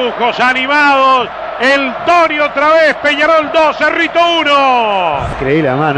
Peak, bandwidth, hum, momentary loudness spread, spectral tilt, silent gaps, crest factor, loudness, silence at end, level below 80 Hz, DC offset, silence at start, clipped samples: -2 dBFS; 9.8 kHz; none; 5 LU; -4.5 dB/octave; none; 10 dB; -10 LUFS; 0 s; -38 dBFS; under 0.1%; 0 s; under 0.1%